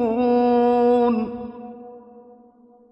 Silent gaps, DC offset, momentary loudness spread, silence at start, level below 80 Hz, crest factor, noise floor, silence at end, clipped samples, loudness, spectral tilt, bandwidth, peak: none; under 0.1%; 21 LU; 0 s; -58 dBFS; 12 dB; -52 dBFS; 0.7 s; under 0.1%; -19 LUFS; -8.5 dB/octave; 5.6 kHz; -8 dBFS